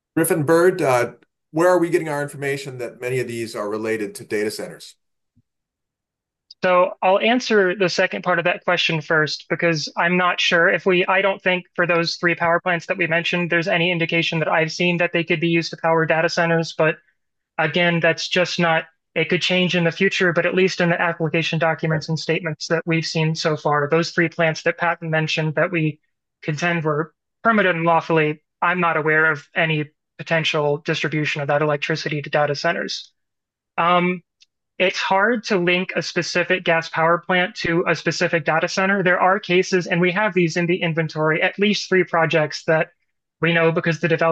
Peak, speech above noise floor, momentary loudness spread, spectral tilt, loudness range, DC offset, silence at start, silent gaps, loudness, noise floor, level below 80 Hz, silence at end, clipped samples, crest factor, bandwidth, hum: -4 dBFS; 65 dB; 7 LU; -5 dB/octave; 4 LU; under 0.1%; 0.15 s; none; -19 LUFS; -84 dBFS; -66 dBFS; 0 s; under 0.1%; 16 dB; 12.5 kHz; none